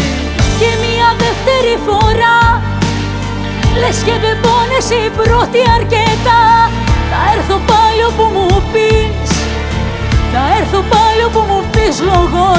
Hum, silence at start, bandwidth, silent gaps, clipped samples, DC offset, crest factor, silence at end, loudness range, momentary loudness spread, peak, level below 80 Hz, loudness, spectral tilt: none; 0 s; 8 kHz; none; under 0.1%; under 0.1%; 10 dB; 0 s; 2 LU; 6 LU; 0 dBFS; -20 dBFS; -11 LUFS; -5 dB/octave